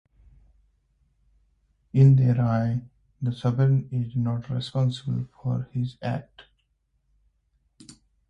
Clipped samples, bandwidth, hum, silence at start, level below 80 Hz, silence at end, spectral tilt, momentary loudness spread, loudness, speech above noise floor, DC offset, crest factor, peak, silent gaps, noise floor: under 0.1%; 8.8 kHz; none; 1.95 s; -56 dBFS; 0.4 s; -9 dB/octave; 13 LU; -25 LUFS; 48 dB; under 0.1%; 18 dB; -8 dBFS; none; -71 dBFS